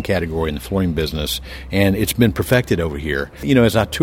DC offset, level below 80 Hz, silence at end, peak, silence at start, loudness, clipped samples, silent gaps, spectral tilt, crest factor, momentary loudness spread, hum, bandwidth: under 0.1%; -32 dBFS; 0 s; 0 dBFS; 0 s; -19 LUFS; under 0.1%; none; -5.5 dB/octave; 18 dB; 8 LU; none; 17.5 kHz